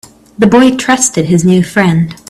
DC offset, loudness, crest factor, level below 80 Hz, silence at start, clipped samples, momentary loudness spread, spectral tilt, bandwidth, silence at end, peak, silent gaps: under 0.1%; -9 LUFS; 10 dB; -42 dBFS; 0.4 s; under 0.1%; 4 LU; -5 dB/octave; 13.5 kHz; 0.15 s; 0 dBFS; none